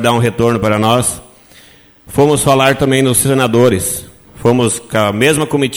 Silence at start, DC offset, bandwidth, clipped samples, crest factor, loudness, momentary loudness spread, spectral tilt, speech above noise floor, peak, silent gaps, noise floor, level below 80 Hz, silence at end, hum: 0 s; under 0.1%; over 20 kHz; under 0.1%; 12 dB; -12 LUFS; 7 LU; -4.5 dB/octave; 31 dB; 0 dBFS; none; -43 dBFS; -40 dBFS; 0 s; none